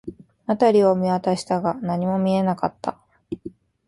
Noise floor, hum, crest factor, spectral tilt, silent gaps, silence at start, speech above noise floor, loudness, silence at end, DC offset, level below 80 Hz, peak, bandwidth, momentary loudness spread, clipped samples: -41 dBFS; none; 18 dB; -7.5 dB/octave; none; 0.05 s; 21 dB; -21 LUFS; 0.4 s; under 0.1%; -58 dBFS; -4 dBFS; 11.5 kHz; 18 LU; under 0.1%